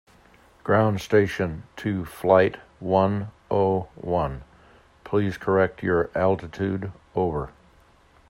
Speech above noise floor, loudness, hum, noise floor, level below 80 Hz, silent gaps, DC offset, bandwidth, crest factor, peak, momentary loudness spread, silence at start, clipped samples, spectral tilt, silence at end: 33 dB; -24 LUFS; none; -56 dBFS; -50 dBFS; none; under 0.1%; 16 kHz; 22 dB; -4 dBFS; 11 LU; 0.65 s; under 0.1%; -7.5 dB/octave; 0.8 s